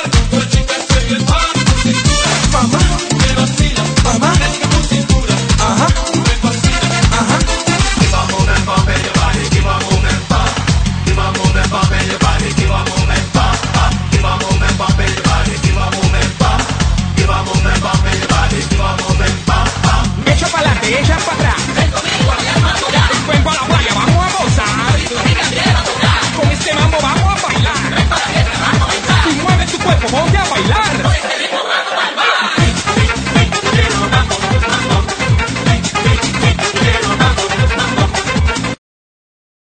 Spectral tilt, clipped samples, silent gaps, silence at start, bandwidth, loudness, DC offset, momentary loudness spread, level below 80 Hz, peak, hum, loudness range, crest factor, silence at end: -4.5 dB/octave; under 0.1%; none; 0 s; 9.4 kHz; -13 LUFS; under 0.1%; 2 LU; -20 dBFS; 0 dBFS; none; 1 LU; 12 dB; 1.05 s